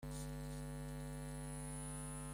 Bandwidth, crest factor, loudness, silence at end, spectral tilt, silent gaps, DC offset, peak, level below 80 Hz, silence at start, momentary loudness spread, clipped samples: 16 kHz; 10 dB; -48 LUFS; 0 s; -5 dB/octave; none; under 0.1%; -36 dBFS; -54 dBFS; 0 s; 1 LU; under 0.1%